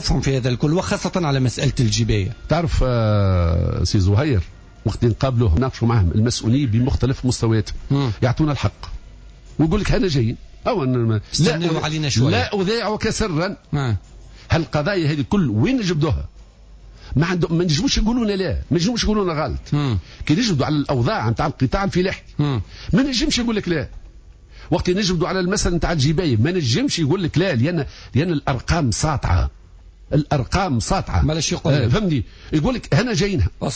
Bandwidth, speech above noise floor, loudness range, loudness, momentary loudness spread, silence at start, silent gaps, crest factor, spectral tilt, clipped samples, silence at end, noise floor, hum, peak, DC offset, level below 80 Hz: 8 kHz; 25 dB; 2 LU; -20 LUFS; 6 LU; 0 s; none; 12 dB; -5.5 dB/octave; under 0.1%; 0 s; -43 dBFS; none; -6 dBFS; under 0.1%; -30 dBFS